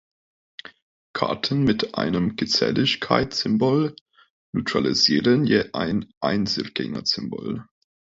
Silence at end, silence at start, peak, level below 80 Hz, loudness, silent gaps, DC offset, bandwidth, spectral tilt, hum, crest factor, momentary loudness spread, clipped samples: 0.55 s; 1.15 s; -2 dBFS; -52 dBFS; -22 LUFS; 4.01-4.06 s, 4.30-4.53 s, 6.17-6.21 s; under 0.1%; 7.8 kHz; -5 dB/octave; none; 20 dB; 12 LU; under 0.1%